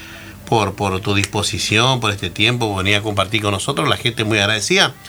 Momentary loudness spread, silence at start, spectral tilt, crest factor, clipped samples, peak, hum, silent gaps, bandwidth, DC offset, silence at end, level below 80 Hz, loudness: 6 LU; 0 s; -3.5 dB/octave; 18 dB; under 0.1%; 0 dBFS; none; none; over 20 kHz; under 0.1%; 0 s; -46 dBFS; -17 LUFS